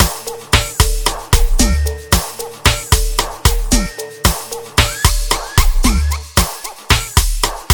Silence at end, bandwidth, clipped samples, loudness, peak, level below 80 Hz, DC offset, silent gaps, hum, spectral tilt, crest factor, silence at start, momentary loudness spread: 0 s; 19.5 kHz; 0.1%; -16 LUFS; 0 dBFS; -18 dBFS; 0.3%; none; none; -3 dB/octave; 14 dB; 0 s; 6 LU